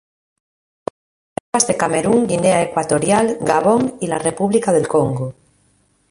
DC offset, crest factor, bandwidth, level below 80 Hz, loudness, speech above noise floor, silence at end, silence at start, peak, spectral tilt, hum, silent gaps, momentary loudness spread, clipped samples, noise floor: under 0.1%; 18 dB; 11.5 kHz; -52 dBFS; -17 LUFS; 43 dB; 0.8 s; 1.55 s; 0 dBFS; -5 dB/octave; none; none; 16 LU; under 0.1%; -59 dBFS